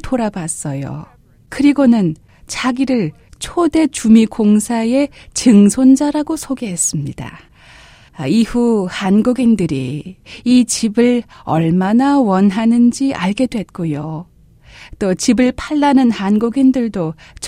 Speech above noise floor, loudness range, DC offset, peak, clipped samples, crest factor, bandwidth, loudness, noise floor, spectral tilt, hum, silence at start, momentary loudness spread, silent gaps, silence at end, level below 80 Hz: 29 dB; 4 LU; under 0.1%; 0 dBFS; under 0.1%; 14 dB; 15 kHz; -14 LUFS; -43 dBFS; -5.5 dB/octave; none; 0.05 s; 13 LU; none; 0 s; -42 dBFS